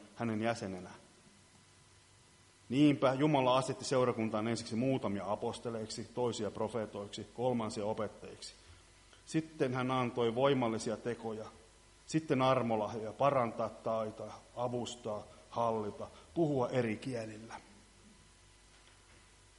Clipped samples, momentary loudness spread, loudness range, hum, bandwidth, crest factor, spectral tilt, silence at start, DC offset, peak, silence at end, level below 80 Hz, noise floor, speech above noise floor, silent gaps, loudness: under 0.1%; 15 LU; 6 LU; none; 11.5 kHz; 20 dB; -6 dB/octave; 0 s; under 0.1%; -16 dBFS; 1.5 s; -68 dBFS; -63 dBFS; 29 dB; none; -35 LUFS